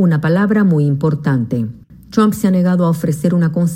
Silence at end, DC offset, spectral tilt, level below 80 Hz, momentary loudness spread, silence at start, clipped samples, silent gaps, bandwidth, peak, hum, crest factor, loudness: 0 s; under 0.1%; -8 dB/octave; -46 dBFS; 7 LU; 0 s; under 0.1%; none; 16 kHz; -2 dBFS; none; 12 dB; -15 LUFS